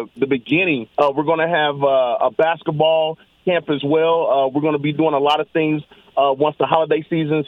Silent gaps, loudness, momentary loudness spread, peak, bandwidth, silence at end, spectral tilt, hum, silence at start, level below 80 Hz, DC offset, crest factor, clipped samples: none; -18 LUFS; 5 LU; 0 dBFS; 7 kHz; 0.05 s; -7.5 dB/octave; none; 0 s; -64 dBFS; under 0.1%; 18 dB; under 0.1%